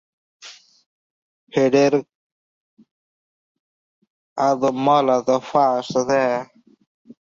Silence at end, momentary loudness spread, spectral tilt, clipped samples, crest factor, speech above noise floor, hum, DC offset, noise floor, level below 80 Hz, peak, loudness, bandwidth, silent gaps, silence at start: 0.75 s; 21 LU; -5.5 dB/octave; under 0.1%; 20 dB; over 72 dB; none; under 0.1%; under -90 dBFS; -66 dBFS; -2 dBFS; -19 LUFS; 7.6 kHz; 0.86-1.47 s, 2.15-2.77 s, 2.91-4.36 s; 0.45 s